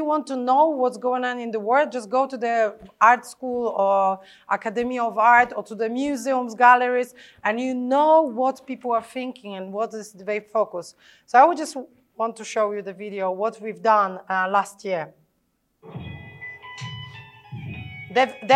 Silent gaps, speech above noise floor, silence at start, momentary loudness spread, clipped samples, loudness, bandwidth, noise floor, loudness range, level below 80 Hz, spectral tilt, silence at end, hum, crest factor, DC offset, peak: none; 49 dB; 0 s; 19 LU; under 0.1%; -22 LUFS; 12.5 kHz; -70 dBFS; 8 LU; -64 dBFS; -4.5 dB/octave; 0 s; none; 20 dB; under 0.1%; -2 dBFS